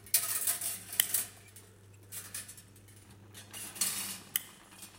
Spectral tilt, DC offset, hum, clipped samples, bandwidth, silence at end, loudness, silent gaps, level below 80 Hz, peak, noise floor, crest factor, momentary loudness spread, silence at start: 0.5 dB/octave; under 0.1%; none; under 0.1%; 17 kHz; 0 s; -33 LUFS; none; -72 dBFS; -4 dBFS; -56 dBFS; 34 dB; 23 LU; 0 s